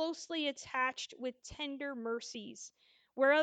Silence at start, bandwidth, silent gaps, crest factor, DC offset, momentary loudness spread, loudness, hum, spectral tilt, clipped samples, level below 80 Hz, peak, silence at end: 0 s; 9.2 kHz; none; 18 dB; under 0.1%; 15 LU; -37 LUFS; none; -2.5 dB/octave; under 0.1%; -70 dBFS; -20 dBFS; 0 s